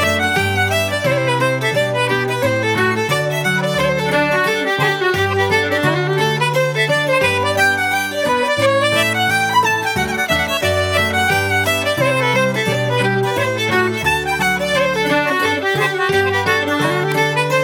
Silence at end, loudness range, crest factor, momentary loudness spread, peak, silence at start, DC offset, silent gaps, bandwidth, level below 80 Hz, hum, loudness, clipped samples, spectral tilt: 0 s; 1 LU; 14 dB; 3 LU; -2 dBFS; 0 s; under 0.1%; none; 19 kHz; -46 dBFS; none; -16 LUFS; under 0.1%; -4 dB/octave